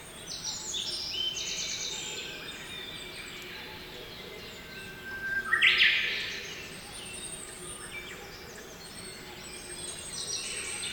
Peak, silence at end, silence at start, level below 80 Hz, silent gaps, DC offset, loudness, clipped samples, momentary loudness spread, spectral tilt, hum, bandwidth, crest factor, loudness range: -10 dBFS; 0 s; 0 s; -58 dBFS; none; under 0.1%; -31 LUFS; under 0.1%; 18 LU; 0 dB/octave; none; over 20 kHz; 26 dB; 12 LU